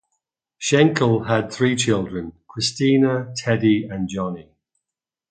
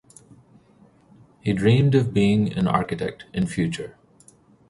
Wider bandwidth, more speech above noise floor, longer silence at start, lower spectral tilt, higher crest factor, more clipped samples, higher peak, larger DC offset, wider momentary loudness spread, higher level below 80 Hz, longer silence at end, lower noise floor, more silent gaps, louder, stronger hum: second, 9.4 kHz vs 11.5 kHz; first, 68 dB vs 34 dB; second, 0.6 s vs 1.45 s; second, -5 dB/octave vs -7.5 dB/octave; about the same, 20 dB vs 20 dB; neither; about the same, -2 dBFS vs -4 dBFS; neither; about the same, 13 LU vs 12 LU; about the same, -52 dBFS vs -50 dBFS; about the same, 0.9 s vs 0.8 s; first, -87 dBFS vs -55 dBFS; neither; about the same, -20 LUFS vs -22 LUFS; neither